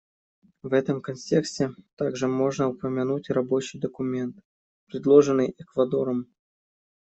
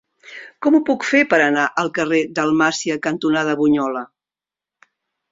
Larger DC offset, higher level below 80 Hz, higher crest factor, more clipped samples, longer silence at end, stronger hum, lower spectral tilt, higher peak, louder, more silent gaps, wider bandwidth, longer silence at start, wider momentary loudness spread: neither; about the same, -66 dBFS vs -62 dBFS; about the same, 20 dB vs 18 dB; neither; second, 0.85 s vs 1.25 s; neither; first, -6.5 dB/octave vs -4.5 dB/octave; second, -6 dBFS vs -2 dBFS; second, -25 LUFS vs -18 LUFS; first, 1.93-1.97 s, 4.45-4.87 s vs none; about the same, 8.2 kHz vs 7.8 kHz; first, 0.65 s vs 0.25 s; about the same, 13 LU vs 14 LU